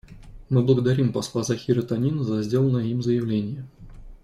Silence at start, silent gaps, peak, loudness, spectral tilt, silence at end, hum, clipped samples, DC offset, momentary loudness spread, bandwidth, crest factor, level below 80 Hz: 0.1 s; none; -6 dBFS; -23 LUFS; -7.5 dB/octave; 0.05 s; none; under 0.1%; under 0.1%; 7 LU; 12.5 kHz; 16 dB; -48 dBFS